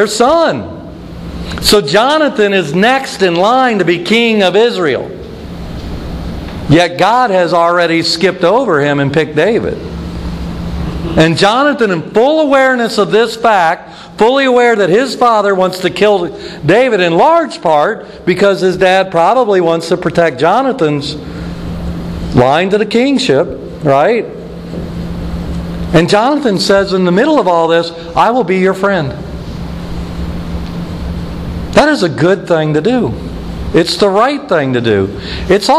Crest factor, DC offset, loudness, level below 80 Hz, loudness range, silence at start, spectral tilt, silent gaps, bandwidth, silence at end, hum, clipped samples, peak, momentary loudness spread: 12 dB; under 0.1%; -11 LUFS; -30 dBFS; 4 LU; 0 s; -5.5 dB/octave; none; 14.5 kHz; 0 s; none; under 0.1%; 0 dBFS; 14 LU